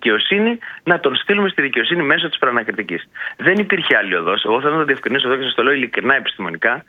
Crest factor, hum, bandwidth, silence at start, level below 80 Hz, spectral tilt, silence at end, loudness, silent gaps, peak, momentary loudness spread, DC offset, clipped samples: 18 dB; none; 6.6 kHz; 0 s; -64 dBFS; -6.5 dB/octave; 0.05 s; -16 LUFS; none; 0 dBFS; 7 LU; under 0.1%; under 0.1%